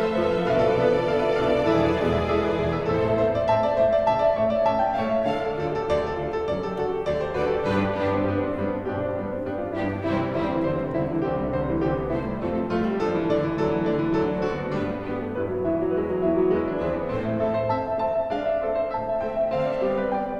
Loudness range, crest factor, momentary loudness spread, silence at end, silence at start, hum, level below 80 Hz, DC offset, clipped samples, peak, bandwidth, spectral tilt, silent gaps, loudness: 4 LU; 16 dB; 6 LU; 0 s; 0 s; none; -44 dBFS; under 0.1%; under 0.1%; -8 dBFS; 9.8 kHz; -8 dB/octave; none; -24 LUFS